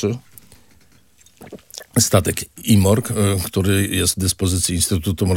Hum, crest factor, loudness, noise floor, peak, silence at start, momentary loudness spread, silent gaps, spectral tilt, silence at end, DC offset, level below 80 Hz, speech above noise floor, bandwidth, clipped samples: none; 20 dB; -18 LUFS; -54 dBFS; 0 dBFS; 0 s; 9 LU; none; -4.5 dB/octave; 0 s; under 0.1%; -44 dBFS; 36 dB; 17 kHz; under 0.1%